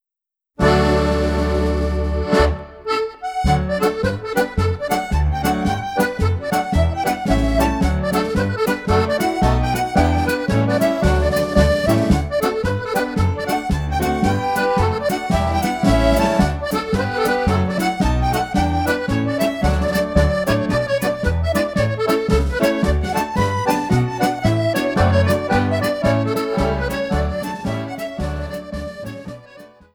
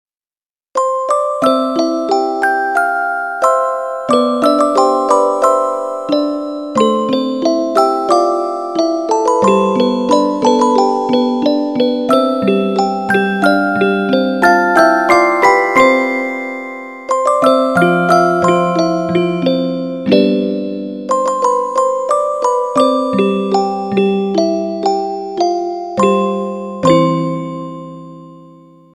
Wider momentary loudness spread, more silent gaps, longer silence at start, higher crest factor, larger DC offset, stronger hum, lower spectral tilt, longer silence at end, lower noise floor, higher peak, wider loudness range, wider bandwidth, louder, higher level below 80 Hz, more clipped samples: about the same, 6 LU vs 8 LU; neither; second, 0.6 s vs 0.75 s; about the same, 16 dB vs 14 dB; second, under 0.1% vs 0.2%; neither; about the same, -6.5 dB/octave vs -5.5 dB/octave; second, 0.25 s vs 0.5 s; about the same, -87 dBFS vs under -90 dBFS; about the same, -2 dBFS vs 0 dBFS; about the same, 2 LU vs 4 LU; first, over 20 kHz vs 14.5 kHz; second, -19 LUFS vs -14 LUFS; first, -26 dBFS vs -58 dBFS; neither